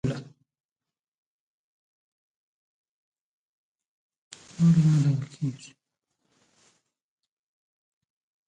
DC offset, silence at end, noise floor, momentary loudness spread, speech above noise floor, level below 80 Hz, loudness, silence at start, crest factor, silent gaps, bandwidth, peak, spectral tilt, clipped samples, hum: under 0.1%; 2.8 s; under -90 dBFS; 22 LU; over 68 dB; -64 dBFS; -24 LUFS; 0.05 s; 18 dB; 0.60-0.76 s, 0.99-3.75 s, 3.86-4.10 s, 4.16-4.31 s; 9.2 kHz; -12 dBFS; -8 dB/octave; under 0.1%; none